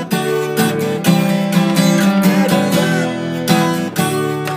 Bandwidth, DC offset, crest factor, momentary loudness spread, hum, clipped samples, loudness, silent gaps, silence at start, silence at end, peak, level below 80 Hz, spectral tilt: 16 kHz; under 0.1%; 14 dB; 5 LU; none; under 0.1%; -15 LUFS; none; 0 s; 0 s; 0 dBFS; -56 dBFS; -5.5 dB/octave